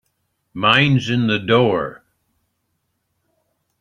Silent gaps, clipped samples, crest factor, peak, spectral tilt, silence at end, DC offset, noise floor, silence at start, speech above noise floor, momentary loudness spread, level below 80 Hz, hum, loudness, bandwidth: none; under 0.1%; 20 dB; -2 dBFS; -6.5 dB/octave; 1.85 s; under 0.1%; -71 dBFS; 0.55 s; 55 dB; 12 LU; -56 dBFS; none; -16 LUFS; 9 kHz